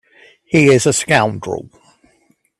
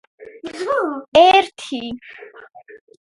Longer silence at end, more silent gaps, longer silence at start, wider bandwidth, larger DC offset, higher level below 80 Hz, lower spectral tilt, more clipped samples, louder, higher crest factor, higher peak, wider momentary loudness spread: first, 1 s vs 0.35 s; second, none vs 1.08-1.12 s; first, 0.5 s vs 0.2 s; first, 13 kHz vs 11.5 kHz; neither; about the same, -52 dBFS vs -56 dBFS; first, -4.5 dB/octave vs -3 dB/octave; neither; about the same, -14 LUFS vs -16 LUFS; about the same, 16 dB vs 18 dB; about the same, 0 dBFS vs 0 dBFS; second, 15 LU vs 23 LU